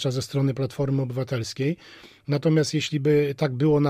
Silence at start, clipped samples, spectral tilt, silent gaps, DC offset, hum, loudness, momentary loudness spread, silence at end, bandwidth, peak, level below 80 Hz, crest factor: 0 s; under 0.1%; -6.5 dB/octave; none; under 0.1%; none; -24 LUFS; 7 LU; 0 s; 15 kHz; -8 dBFS; -56 dBFS; 14 dB